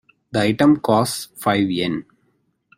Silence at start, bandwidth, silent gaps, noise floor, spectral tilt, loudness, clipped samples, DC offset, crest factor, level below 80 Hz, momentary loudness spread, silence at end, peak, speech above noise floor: 0.35 s; 16 kHz; none; -66 dBFS; -5.5 dB/octave; -19 LUFS; under 0.1%; under 0.1%; 16 dB; -54 dBFS; 9 LU; 0.75 s; -4 dBFS; 48 dB